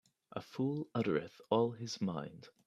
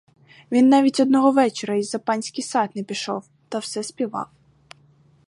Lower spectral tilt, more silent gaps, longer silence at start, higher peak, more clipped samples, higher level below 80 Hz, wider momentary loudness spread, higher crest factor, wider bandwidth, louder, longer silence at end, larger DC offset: first, -6.5 dB/octave vs -4.5 dB/octave; neither; second, 0.35 s vs 0.5 s; second, -18 dBFS vs -4 dBFS; neither; about the same, -76 dBFS vs -72 dBFS; about the same, 14 LU vs 14 LU; about the same, 20 dB vs 18 dB; first, 13 kHz vs 11.5 kHz; second, -37 LUFS vs -21 LUFS; second, 0.2 s vs 1.05 s; neither